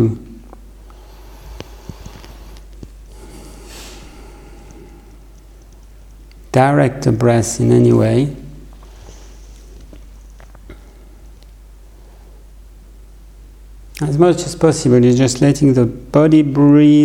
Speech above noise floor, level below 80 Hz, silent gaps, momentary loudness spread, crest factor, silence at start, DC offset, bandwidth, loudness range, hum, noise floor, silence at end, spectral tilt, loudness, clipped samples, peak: 28 dB; -38 dBFS; none; 26 LU; 16 dB; 0 s; under 0.1%; 14.5 kHz; 24 LU; none; -40 dBFS; 0 s; -7 dB/octave; -13 LUFS; under 0.1%; 0 dBFS